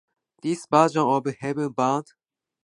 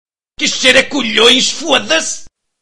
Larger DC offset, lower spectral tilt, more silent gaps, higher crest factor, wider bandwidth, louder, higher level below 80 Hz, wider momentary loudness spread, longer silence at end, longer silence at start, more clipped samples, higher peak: second, under 0.1% vs 3%; first, -6 dB/octave vs -1 dB/octave; neither; first, 22 dB vs 14 dB; about the same, 11.5 kHz vs 12 kHz; second, -24 LUFS vs -10 LUFS; second, -72 dBFS vs -48 dBFS; about the same, 10 LU vs 9 LU; first, 0.65 s vs 0 s; first, 0.45 s vs 0.05 s; second, under 0.1% vs 0.4%; second, -4 dBFS vs 0 dBFS